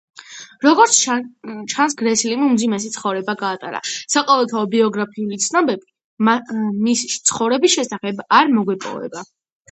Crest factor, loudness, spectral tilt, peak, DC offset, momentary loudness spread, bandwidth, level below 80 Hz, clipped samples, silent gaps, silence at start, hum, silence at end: 18 dB; -17 LUFS; -2.5 dB/octave; 0 dBFS; under 0.1%; 14 LU; 9 kHz; -68 dBFS; under 0.1%; 6.04-6.17 s; 0.2 s; none; 0.5 s